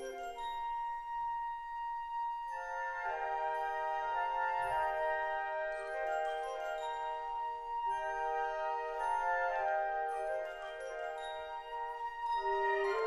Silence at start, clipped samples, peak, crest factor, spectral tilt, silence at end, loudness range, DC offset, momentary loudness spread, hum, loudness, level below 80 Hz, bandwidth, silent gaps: 0 s; under 0.1%; -24 dBFS; 14 dB; -2.5 dB/octave; 0 s; 2 LU; under 0.1%; 8 LU; none; -37 LUFS; -62 dBFS; 13.5 kHz; none